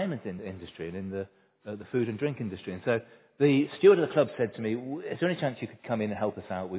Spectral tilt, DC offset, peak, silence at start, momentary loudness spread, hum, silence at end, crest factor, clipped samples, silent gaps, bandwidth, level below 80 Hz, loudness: -11 dB/octave; under 0.1%; -8 dBFS; 0 s; 18 LU; none; 0 s; 20 dB; under 0.1%; none; 4 kHz; -62 dBFS; -29 LUFS